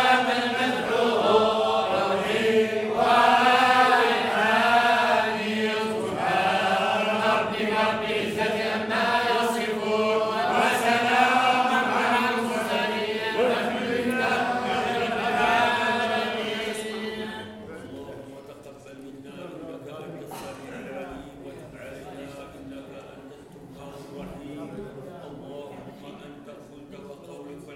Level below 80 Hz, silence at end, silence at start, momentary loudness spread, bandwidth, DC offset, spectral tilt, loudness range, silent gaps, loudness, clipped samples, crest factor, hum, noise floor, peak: -60 dBFS; 0 s; 0 s; 22 LU; 16.5 kHz; under 0.1%; -4 dB/octave; 20 LU; none; -23 LUFS; under 0.1%; 20 dB; none; -44 dBFS; -6 dBFS